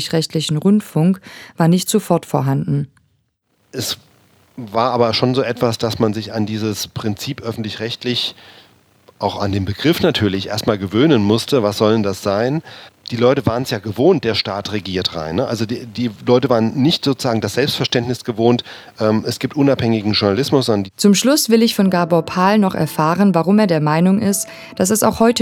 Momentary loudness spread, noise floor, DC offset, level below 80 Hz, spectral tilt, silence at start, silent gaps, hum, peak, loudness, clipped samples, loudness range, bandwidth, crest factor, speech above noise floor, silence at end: 10 LU; -64 dBFS; under 0.1%; -52 dBFS; -5 dB/octave; 0 s; none; none; 0 dBFS; -17 LUFS; under 0.1%; 6 LU; 18 kHz; 16 dB; 48 dB; 0 s